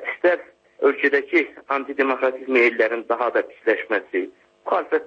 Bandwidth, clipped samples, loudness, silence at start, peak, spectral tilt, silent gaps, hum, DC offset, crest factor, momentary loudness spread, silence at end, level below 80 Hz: 7 kHz; under 0.1%; -21 LUFS; 0 s; -6 dBFS; -5 dB/octave; none; none; under 0.1%; 16 dB; 9 LU; 0 s; -74 dBFS